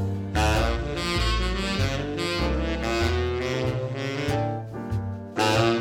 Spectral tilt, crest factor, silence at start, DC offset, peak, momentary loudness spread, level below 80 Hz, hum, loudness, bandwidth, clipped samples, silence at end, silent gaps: -5.5 dB/octave; 18 dB; 0 s; under 0.1%; -8 dBFS; 8 LU; -32 dBFS; none; -26 LUFS; 18 kHz; under 0.1%; 0 s; none